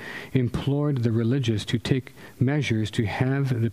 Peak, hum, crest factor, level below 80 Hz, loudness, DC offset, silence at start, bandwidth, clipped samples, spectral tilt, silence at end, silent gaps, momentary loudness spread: -6 dBFS; none; 18 dB; -50 dBFS; -25 LUFS; under 0.1%; 0 s; 13 kHz; under 0.1%; -7 dB/octave; 0 s; none; 4 LU